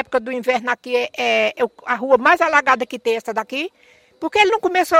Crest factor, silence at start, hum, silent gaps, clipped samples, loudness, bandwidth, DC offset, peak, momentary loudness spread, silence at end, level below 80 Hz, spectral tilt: 18 dB; 0 s; none; none; under 0.1%; -18 LUFS; 16.5 kHz; under 0.1%; 0 dBFS; 10 LU; 0 s; -60 dBFS; -2.5 dB/octave